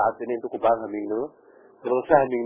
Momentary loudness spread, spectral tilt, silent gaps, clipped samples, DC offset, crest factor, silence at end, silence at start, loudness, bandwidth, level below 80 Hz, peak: 11 LU; -10 dB/octave; none; under 0.1%; under 0.1%; 22 dB; 0 s; 0 s; -24 LUFS; 3.7 kHz; -62 dBFS; -4 dBFS